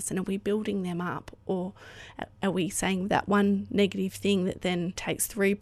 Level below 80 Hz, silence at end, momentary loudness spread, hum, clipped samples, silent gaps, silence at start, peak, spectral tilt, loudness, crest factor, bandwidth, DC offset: -56 dBFS; 0 s; 12 LU; none; under 0.1%; none; 0 s; -10 dBFS; -5 dB/octave; -29 LUFS; 20 dB; 14.5 kHz; under 0.1%